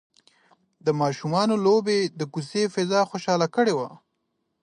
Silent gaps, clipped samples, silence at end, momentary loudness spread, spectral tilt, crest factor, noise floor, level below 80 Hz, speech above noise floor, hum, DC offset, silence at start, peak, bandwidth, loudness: none; under 0.1%; 0.65 s; 9 LU; -5.5 dB/octave; 16 dB; -76 dBFS; -72 dBFS; 53 dB; none; under 0.1%; 0.85 s; -8 dBFS; 10.5 kHz; -24 LUFS